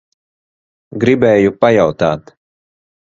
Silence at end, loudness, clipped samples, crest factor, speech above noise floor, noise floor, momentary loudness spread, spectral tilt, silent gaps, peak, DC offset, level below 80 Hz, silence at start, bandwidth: 0.85 s; -13 LUFS; under 0.1%; 16 dB; over 78 dB; under -90 dBFS; 11 LU; -7 dB/octave; none; 0 dBFS; under 0.1%; -48 dBFS; 0.9 s; 7.6 kHz